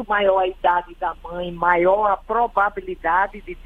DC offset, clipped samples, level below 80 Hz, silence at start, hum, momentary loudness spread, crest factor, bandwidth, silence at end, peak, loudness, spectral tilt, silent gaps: under 0.1%; under 0.1%; -42 dBFS; 0 s; none; 11 LU; 18 dB; 4.2 kHz; 0.05 s; -2 dBFS; -20 LUFS; -7 dB/octave; none